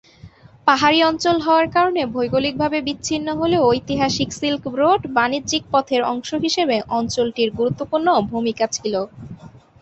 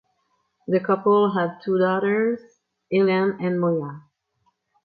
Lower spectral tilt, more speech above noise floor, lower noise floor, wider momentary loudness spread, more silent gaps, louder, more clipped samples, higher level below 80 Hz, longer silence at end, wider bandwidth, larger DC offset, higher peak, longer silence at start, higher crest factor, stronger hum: second, -4 dB/octave vs -9.5 dB/octave; second, 26 dB vs 50 dB; second, -44 dBFS vs -70 dBFS; about the same, 7 LU vs 8 LU; neither; first, -19 LUFS vs -22 LUFS; neither; first, -50 dBFS vs -72 dBFS; second, 0.3 s vs 0.85 s; first, 8.4 kHz vs 4.9 kHz; neither; first, -2 dBFS vs -8 dBFS; second, 0.25 s vs 0.7 s; about the same, 18 dB vs 16 dB; neither